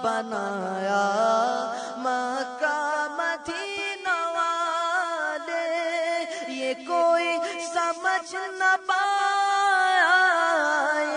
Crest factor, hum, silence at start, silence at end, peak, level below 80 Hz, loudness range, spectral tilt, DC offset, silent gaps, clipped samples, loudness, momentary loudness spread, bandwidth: 16 dB; none; 0 s; 0 s; -8 dBFS; -74 dBFS; 5 LU; -2.5 dB/octave; under 0.1%; none; under 0.1%; -24 LUFS; 9 LU; 10.5 kHz